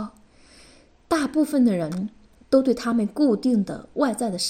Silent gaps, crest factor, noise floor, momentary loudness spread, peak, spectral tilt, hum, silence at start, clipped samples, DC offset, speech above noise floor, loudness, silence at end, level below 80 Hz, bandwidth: none; 18 dB; -52 dBFS; 10 LU; -6 dBFS; -5.5 dB/octave; none; 0 s; under 0.1%; under 0.1%; 31 dB; -23 LUFS; 0 s; -56 dBFS; 16 kHz